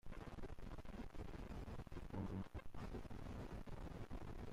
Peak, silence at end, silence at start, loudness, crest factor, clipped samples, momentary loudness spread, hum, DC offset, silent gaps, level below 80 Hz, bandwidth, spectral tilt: -38 dBFS; 0 s; 0.05 s; -54 LUFS; 12 dB; under 0.1%; 6 LU; none; under 0.1%; none; -54 dBFS; 15 kHz; -7 dB/octave